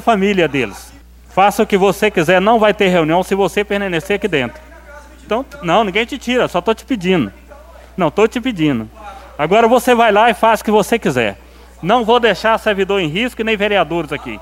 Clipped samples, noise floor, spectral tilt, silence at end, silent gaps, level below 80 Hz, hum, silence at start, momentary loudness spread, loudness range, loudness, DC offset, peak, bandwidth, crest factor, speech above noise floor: under 0.1%; -38 dBFS; -5 dB/octave; 0 s; none; -40 dBFS; none; 0 s; 10 LU; 4 LU; -15 LUFS; under 0.1%; 0 dBFS; 16.5 kHz; 14 dB; 24 dB